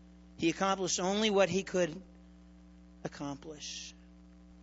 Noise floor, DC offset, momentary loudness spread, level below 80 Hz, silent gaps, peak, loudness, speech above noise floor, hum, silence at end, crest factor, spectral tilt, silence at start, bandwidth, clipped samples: -56 dBFS; under 0.1%; 17 LU; -60 dBFS; none; -14 dBFS; -33 LUFS; 23 dB; none; 0 s; 20 dB; -3.5 dB/octave; 0 s; 8 kHz; under 0.1%